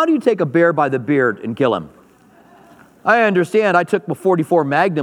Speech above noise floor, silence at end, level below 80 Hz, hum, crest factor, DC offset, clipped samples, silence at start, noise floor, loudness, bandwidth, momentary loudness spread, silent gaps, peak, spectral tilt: 33 dB; 0 s; -66 dBFS; none; 16 dB; under 0.1%; under 0.1%; 0 s; -49 dBFS; -16 LUFS; 13.5 kHz; 5 LU; none; 0 dBFS; -7 dB/octave